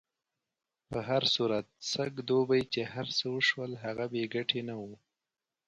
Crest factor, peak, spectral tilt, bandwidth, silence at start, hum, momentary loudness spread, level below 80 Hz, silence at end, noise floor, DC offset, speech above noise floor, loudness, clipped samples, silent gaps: 18 dB; -14 dBFS; -4.5 dB/octave; 9.2 kHz; 0.9 s; none; 11 LU; -68 dBFS; 0.7 s; under -90 dBFS; under 0.1%; over 58 dB; -32 LUFS; under 0.1%; none